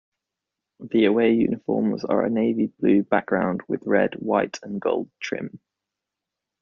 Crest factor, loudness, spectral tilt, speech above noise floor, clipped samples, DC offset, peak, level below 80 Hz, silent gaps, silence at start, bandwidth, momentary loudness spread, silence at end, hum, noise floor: 18 dB; -23 LUFS; -5.5 dB/octave; 63 dB; under 0.1%; under 0.1%; -4 dBFS; -62 dBFS; none; 0.8 s; 7.2 kHz; 10 LU; 1.05 s; none; -86 dBFS